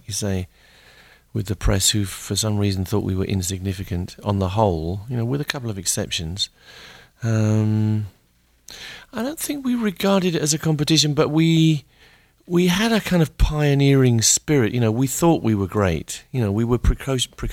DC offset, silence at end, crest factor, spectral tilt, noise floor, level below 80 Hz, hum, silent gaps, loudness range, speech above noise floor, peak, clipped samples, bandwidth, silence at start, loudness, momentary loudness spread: under 0.1%; 0 s; 18 dB; -4.5 dB/octave; -60 dBFS; -34 dBFS; none; none; 6 LU; 40 dB; -2 dBFS; under 0.1%; 16.5 kHz; 0.1 s; -20 LUFS; 11 LU